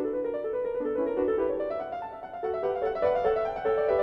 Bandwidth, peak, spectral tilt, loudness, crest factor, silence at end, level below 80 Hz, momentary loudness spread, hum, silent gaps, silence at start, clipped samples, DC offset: 5.6 kHz; -12 dBFS; -7.5 dB/octave; -29 LUFS; 16 dB; 0 s; -56 dBFS; 8 LU; none; none; 0 s; under 0.1%; under 0.1%